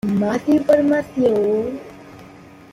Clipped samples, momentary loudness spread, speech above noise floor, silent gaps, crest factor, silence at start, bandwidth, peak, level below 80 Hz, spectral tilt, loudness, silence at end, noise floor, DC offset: under 0.1%; 14 LU; 25 dB; none; 16 dB; 0.05 s; 15 kHz; -4 dBFS; -54 dBFS; -7.5 dB/octave; -18 LUFS; 0.45 s; -42 dBFS; under 0.1%